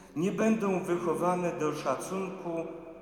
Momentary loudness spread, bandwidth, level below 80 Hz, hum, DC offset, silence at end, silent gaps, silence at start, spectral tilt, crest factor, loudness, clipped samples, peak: 9 LU; 17 kHz; -66 dBFS; none; under 0.1%; 0 s; none; 0 s; -6.5 dB/octave; 16 dB; -31 LUFS; under 0.1%; -16 dBFS